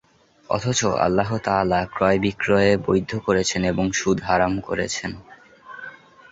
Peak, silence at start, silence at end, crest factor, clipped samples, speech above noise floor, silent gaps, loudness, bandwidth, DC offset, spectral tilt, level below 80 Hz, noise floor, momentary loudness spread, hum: -4 dBFS; 0.5 s; 0.4 s; 18 dB; under 0.1%; 23 dB; none; -21 LUFS; 8 kHz; under 0.1%; -4.5 dB/octave; -46 dBFS; -43 dBFS; 17 LU; none